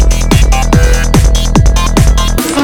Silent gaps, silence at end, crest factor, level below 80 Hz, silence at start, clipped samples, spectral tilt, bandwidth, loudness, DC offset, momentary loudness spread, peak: none; 0 s; 6 dB; -8 dBFS; 0 s; 0.3%; -5 dB/octave; 18 kHz; -10 LUFS; under 0.1%; 1 LU; 0 dBFS